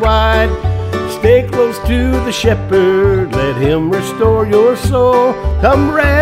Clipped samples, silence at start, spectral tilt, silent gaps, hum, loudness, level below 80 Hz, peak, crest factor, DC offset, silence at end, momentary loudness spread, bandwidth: under 0.1%; 0 s; -6.5 dB/octave; none; none; -12 LUFS; -20 dBFS; 0 dBFS; 12 dB; under 0.1%; 0 s; 5 LU; 16 kHz